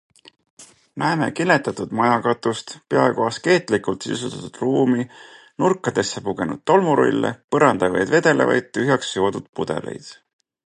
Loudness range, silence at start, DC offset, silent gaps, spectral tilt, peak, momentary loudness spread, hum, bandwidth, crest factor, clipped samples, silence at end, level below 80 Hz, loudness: 3 LU; 0.6 s; under 0.1%; 7.44-7.48 s, 9.49-9.53 s; -5.5 dB/octave; -2 dBFS; 11 LU; none; 11.5 kHz; 20 dB; under 0.1%; 0.55 s; -58 dBFS; -20 LUFS